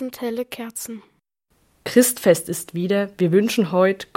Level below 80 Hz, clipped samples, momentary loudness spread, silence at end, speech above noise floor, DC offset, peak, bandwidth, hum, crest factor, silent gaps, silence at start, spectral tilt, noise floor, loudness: -64 dBFS; under 0.1%; 15 LU; 0.15 s; 46 dB; under 0.1%; -2 dBFS; 17 kHz; none; 20 dB; none; 0 s; -5 dB/octave; -66 dBFS; -20 LUFS